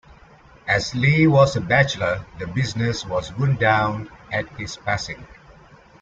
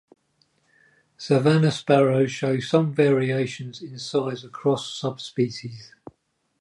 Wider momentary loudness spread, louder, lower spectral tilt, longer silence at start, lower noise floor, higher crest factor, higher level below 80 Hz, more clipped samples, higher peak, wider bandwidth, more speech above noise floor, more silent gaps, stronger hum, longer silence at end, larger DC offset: about the same, 14 LU vs 16 LU; about the same, -21 LUFS vs -23 LUFS; about the same, -6 dB/octave vs -6.5 dB/octave; second, 0.65 s vs 1.2 s; second, -49 dBFS vs -70 dBFS; about the same, 18 dB vs 18 dB; first, -46 dBFS vs -68 dBFS; neither; about the same, -4 dBFS vs -6 dBFS; second, 7.8 kHz vs 11.5 kHz; second, 28 dB vs 48 dB; neither; neither; about the same, 0.7 s vs 0.75 s; neither